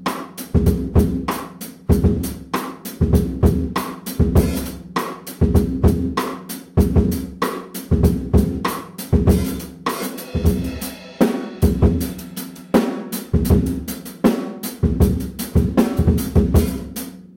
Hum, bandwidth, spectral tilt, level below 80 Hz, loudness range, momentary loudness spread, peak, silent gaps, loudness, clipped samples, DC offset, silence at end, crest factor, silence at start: none; 17 kHz; -7 dB/octave; -26 dBFS; 2 LU; 11 LU; -4 dBFS; none; -20 LUFS; under 0.1%; under 0.1%; 0.1 s; 16 dB; 0 s